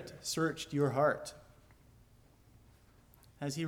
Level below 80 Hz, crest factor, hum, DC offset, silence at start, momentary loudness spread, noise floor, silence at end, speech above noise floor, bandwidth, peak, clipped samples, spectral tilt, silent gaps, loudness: -66 dBFS; 18 dB; none; under 0.1%; 0 s; 12 LU; -63 dBFS; 0 s; 29 dB; 19 kHz; -20 dBFS; under 0.1%; -5 dB/octave; none; -34 LUFS